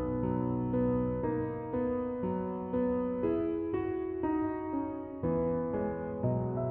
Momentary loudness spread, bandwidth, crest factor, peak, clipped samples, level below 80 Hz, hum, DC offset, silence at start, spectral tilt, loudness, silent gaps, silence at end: 4 LU; 3.5 kHz; 14 dB; -20 dBFS; under 0.1%; -52 dBFS; none; under 0.1%; 0 s; -10 dB/octave; -33 LUFS; none; 0 s